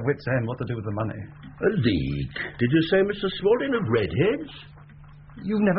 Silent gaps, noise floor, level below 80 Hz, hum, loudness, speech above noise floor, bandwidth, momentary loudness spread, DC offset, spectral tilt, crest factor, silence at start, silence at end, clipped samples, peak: none; -46 dBFS; -46 dBFS; none; -25 LUFS; 22 dB; 5.4 kHz; 11 LU; under 0.1%; -5.5 dB/octave; 16 dB; 0 s; 0 s; under 0.1%; -8 dBFS